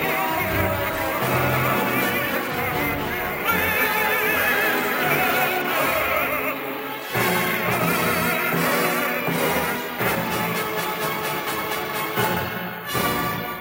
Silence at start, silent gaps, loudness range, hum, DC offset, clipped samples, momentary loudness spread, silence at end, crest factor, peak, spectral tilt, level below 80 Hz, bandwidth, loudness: 0 s; none; 4 LU; none; under 0.1%; under 0.1%; 6 LU; 0 s; 14 dB; -8 dBFS; -4 dB/octave; -48 dBFS; 17 kHz; -22 LUFS